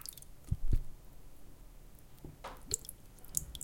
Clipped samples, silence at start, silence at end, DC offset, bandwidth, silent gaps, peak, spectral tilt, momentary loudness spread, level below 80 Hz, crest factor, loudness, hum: under 0.1%; 0 s; 0 s; under 0.1%; 17 kHz; none; -10 dBFS; -3.5 dB/octave; 21 LU; -42 dBFS; 30 dB; -41 LUFS; none